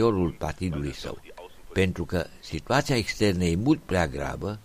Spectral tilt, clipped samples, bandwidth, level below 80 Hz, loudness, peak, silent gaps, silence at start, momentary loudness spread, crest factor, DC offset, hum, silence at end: -6 dB/octave; under 0.1%; 15.5 kHz; -42 dBFS; -27 LUFS; -8 dBFS; none; 0 s; 14 LU; 18 dB; under 0.1%; none; 0.05 s